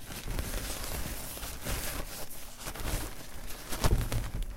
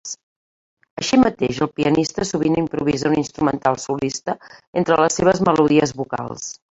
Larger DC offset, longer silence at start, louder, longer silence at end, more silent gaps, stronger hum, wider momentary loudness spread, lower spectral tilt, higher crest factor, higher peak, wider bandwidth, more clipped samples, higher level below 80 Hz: neither; about the same, 0 s vs 0.05 s; second, -37 LUFS vs -19 LUFS; second, 0 s vs 0.2 s; second, none vs 0.23-0.77 s, 0.91-0.97 s, 4.67-4.73 s; neither; about the same, 11 LU vs 13 LU; second, -3.5 dB/octave vs -5 dB/octave; about the same, 22 dB vs 18 dB; second, -12 dBFS vs -2 dBFS; first, 17 kHz vs 8 kHz; neither; first, -38 dBFS vs -50 dBFS